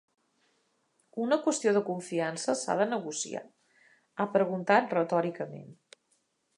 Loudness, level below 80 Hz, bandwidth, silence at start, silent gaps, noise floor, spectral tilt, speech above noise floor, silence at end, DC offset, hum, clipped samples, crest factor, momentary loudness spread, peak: -29 LUFS; -84 dBFS; 11.5 kHz; 1.15 s; none; -74 dBFS; -4.5 dB/octave; 45 dB; 0.85 s; under 0.1%; none; under 0.1%; 22 dB; 15 LU; -8 dBFS